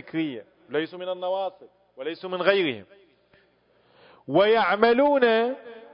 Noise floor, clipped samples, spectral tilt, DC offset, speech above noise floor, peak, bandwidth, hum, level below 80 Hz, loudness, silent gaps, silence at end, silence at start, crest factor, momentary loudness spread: -63 dBFS; under 0.1%; -9 dB/octave; under 0.1%; 40 dB; -4 dBFS; 5.4 kHz; 60 Hz at -65 dBFS; -70 dBFS; -24 LUFS; none; 0.15 s; 0.05 s; 20 dB; 16 LU